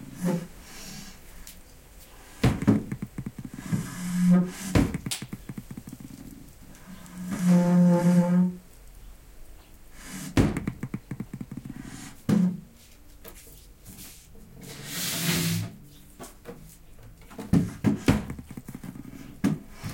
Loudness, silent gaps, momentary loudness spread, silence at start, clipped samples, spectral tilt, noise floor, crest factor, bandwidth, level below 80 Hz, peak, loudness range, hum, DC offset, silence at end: -26 LUFS; none; 24 LU; 0 s; under 0.1%; -6 dB/octave; -50 dBFS; 22 dB; 17 kHz; -46 dBFS; -8 dBFS; 8 LU; none; under 0.1%; 0 s